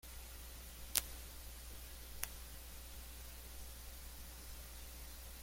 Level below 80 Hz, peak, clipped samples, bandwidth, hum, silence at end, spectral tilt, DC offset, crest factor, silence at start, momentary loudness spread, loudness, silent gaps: -54 dBFS; -6 dBFS; under 0.1%; 16.5 kHz; none; 0 s; -1.5 dB/octave; under 0.1%; 42 dB; 0.05 s; 13 LU; -48 LUFS; none